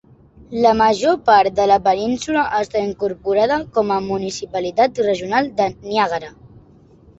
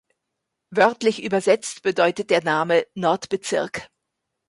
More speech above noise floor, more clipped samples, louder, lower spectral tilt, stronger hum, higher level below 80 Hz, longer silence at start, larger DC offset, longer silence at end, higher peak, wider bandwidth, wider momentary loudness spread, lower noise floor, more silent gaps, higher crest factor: second, 30 dB vs 59 dB; neither; first, -18 LUFS vs -21 LUFS; about the same, -4.5 dB/octave vs -4 dB/octave; neither; first, -50 dBFS vs -64 dBFS; second, 0.5 s vs 0.7 s; neither; about the same, 0.7 s vs 0.65 s; about the same, -2 dBFS vs -4 dBFS; second, 8.2 kHz vs 11.5 kHz; first, 10 LU vs 6 LU; second, -48 dBFS vs -80 dBFS; neither; about the same, 16 dB vs 18 dB